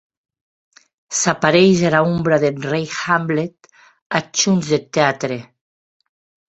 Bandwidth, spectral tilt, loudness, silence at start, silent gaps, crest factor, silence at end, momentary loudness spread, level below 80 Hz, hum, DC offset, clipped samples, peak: 8.2 kHz; -4.5 dB/octave; -17 LUFS; 1.1 s; 4.02-4.10 s; 18 dB; 1.15 s; 11 LU; -56 dBFS; none; under 0.1%; under 0.1%; -2 dBFS